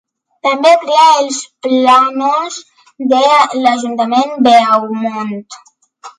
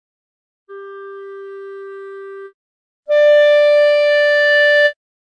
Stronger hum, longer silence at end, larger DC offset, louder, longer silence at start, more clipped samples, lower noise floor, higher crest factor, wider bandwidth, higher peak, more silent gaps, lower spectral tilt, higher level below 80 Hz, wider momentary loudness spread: neither; second, 0.1 s vs 0.35 s; neither; about the same, -11 LUFS vs -12 LUFS; second, 0.45 s vs 0.7 s; neither; first, -38 dBFS vs -32 dBFS; about the same, 12 dB vs 12 dB; first, 11.5 kHz vs 8.8 kHz; first, 0 dBFS vs -4 dBFS; second, none vs 2.54-3.03 s; first, -3 dB/octave vs 0 dB/octave; first, -64 dBFS vs -78 dBFS; second, 13 LU vs 22 LU